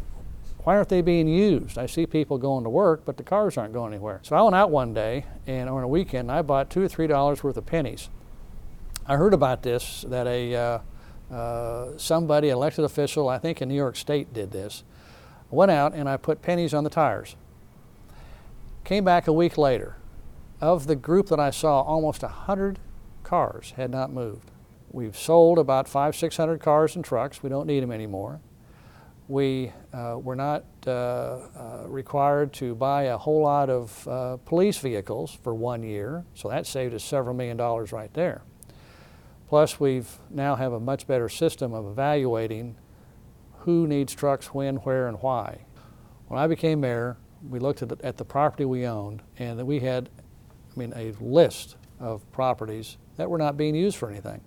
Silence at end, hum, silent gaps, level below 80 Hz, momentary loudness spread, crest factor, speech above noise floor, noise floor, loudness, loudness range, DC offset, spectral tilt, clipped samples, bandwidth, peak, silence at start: 0.05 s; none; none; -46 dBFS; 15 LU; 20 dB; 26 dB; -50 dBFS; -25 LUFS; 6 LU; under 0.1%; -6.5 dB/octave; under 0.1%; 19 kHz; -4 dBFS; 0 s